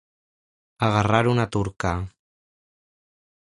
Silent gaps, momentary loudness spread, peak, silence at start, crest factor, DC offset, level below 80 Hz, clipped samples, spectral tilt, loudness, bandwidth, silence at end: none; 10 LU; -2 dBFS; 0.8 s; 24 dB; under 0.1%; -44 dBFS; under 0.1%; -6.5 dB/octave; -23 LUFS; 11 kHz; 1.4 s